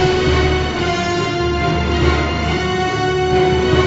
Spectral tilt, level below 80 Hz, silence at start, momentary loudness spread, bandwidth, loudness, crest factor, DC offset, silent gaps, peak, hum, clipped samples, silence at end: -5.5 dB/octave; -24 dBFS; 0 s; 3 LU; 8 kHz; -16 LUFS; 14 dB; under 0.1%; none; -2 dBFS; none; under 0.1%; 0 s